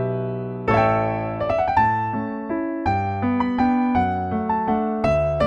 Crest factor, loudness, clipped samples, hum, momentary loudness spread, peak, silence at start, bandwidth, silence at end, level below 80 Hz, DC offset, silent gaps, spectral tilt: 14 dB; -22 LUFS; under 0.1%; none; 8 LU; -6 dBFS; 0 s; 7 kHz; 0 s; -42 dBFS; under 0.1%; none; -8.5 dB/octave